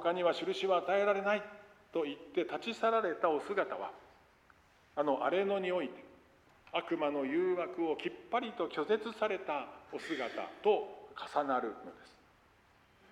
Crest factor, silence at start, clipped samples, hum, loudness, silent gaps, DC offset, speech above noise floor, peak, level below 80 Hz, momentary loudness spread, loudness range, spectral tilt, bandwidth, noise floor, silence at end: 18 dB; 0 s; under 0.1%; none; -35 LUFS; none; under 0.1%; 32 dB; -18 dBFS; -76 dBFS; 12 LU; 4 LU; -5.5 dB/octave; 11.5 kHz; -66 dBFS; 1.05 s